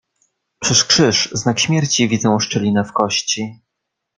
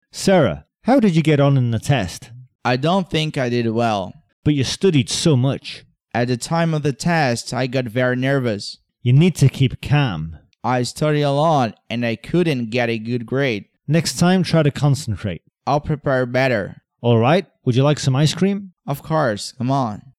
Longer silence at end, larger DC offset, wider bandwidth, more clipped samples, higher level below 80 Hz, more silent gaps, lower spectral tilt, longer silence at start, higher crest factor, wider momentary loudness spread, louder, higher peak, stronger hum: first, 0.65 s vs 0.2 s; neither; second, 11 kHz vs 14 kHz; neither; second, -54 dBFS vs -48 dBFS; second, none vs 2.55-2.59 s, 4.33-4.43 s; second, -3.5 dB/octave vs -6 dB/octave; first, 0.6 s vs 0.15 s; about the same, 18 dB vs 14 dB; about the same, 9 LU vs 11 LU; first, -16 LUFS vs -19 LUFS; first, 0 dBFS vs -4 dBFS; neither